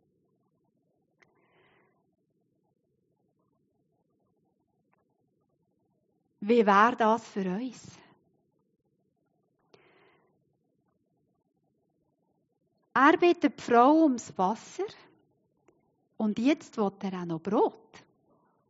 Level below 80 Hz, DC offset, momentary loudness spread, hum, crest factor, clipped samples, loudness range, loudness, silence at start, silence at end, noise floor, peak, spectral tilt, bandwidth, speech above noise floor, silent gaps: -82 dBFS; under 0.1%; 15 LU; none; 24 dB; under 0.1%; 9 LU; -26 LUFS; 6.4 s; 1 s; -76 dBFS; -8 dBFS; -4.5 dB/octave; 7.6 kHz; 50 dB; none